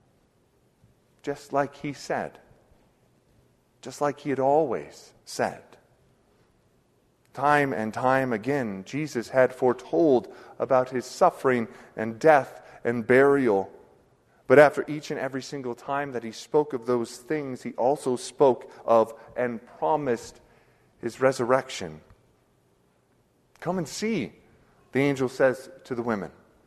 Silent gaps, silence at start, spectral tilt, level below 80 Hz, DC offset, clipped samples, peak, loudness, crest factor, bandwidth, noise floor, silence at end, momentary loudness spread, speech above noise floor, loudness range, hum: none; 1.25 s; -5.5 dB/octave; -66 dBFS; under 0.1%; under 0.1%; -2 dBFS; -25 LUFS; 24 dB; 13.5 kHz; -65 dBFS; 0.35 s; 16 LU; 40 dB; 8 LU; none